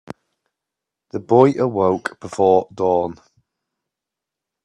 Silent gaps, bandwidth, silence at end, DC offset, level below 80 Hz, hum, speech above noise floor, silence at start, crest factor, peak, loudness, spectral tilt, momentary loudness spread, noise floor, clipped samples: none; 10 kHz; 1.5 s; under 0.1%; -62 dBFS; none; 68 dB; 1.15 s; 20 dB; 0 dBFS; -18 LUFS; -7.5 dB/octave; 14 LU; -85 dBFS; under 0.1%